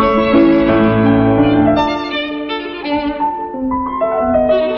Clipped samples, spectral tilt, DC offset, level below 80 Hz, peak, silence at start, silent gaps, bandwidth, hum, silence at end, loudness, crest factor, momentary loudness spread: under 0.1%; -8.5 dB/octave; under 0.1%; -36 dBFS; -2 dBFS; 0 s; none; 6.6 kHz; none; 0 s; -14 LUFS; 12 dB; 9 LU